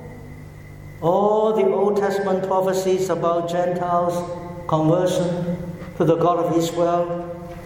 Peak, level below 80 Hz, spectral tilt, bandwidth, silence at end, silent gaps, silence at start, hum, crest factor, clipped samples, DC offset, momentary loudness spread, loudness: -6 dBFS; -50 dBFS; -6.5 dB/octave; 17 kHz; 0 s; none; 0 s; none; 16 dB; under 0.1%; under 0.1%; 15 LU; -21 LUFS